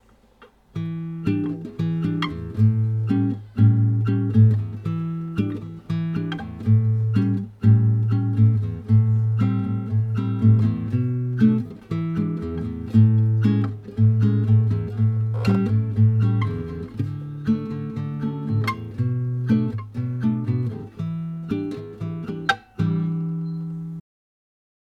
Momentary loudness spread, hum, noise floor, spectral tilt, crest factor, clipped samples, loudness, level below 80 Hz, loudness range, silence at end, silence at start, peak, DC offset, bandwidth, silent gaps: 11 LU; none; -53 dBFS; -9.5 dB/octave; 18 dB; under 0.1%; -22 LUFS; -50 dBFS; 6 LU; 1 s; 0.4 s; -4 dBFS; under 0.1%; 5.2 kHz; none